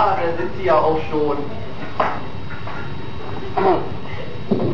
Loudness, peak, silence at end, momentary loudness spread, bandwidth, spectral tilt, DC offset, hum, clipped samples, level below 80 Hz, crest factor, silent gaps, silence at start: -22 LUFS; -4 dBFS; 0 s; 14 LU; 6 kHz; -8 dB/octave; 7%; none; under 0.1%; -44 dBFS; 18 dB; none; 0 s